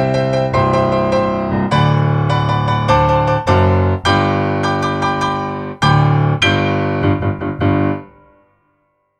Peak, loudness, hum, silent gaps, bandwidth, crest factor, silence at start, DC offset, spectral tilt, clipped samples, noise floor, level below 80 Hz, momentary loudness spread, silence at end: 0 dBFS; -15 LUFS; none; none; 9.6 kHz; 14 dB; 0 s; under 0.1%; -7 dB/octave; under 0.1%; -63 dBFS; -36 dBFS; 5 LU; 1.15 s